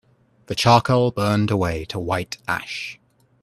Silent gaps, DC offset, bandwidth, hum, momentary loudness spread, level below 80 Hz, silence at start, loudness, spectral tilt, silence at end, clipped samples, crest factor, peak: none; under 0.1%; 13.5 kHz; none; 14 LU; -48 dBFS; 0.5 s; -21 LUFS; -5.5 dB/octave; 0.5 s; under 0.1%; 22 dB; 0 dBFS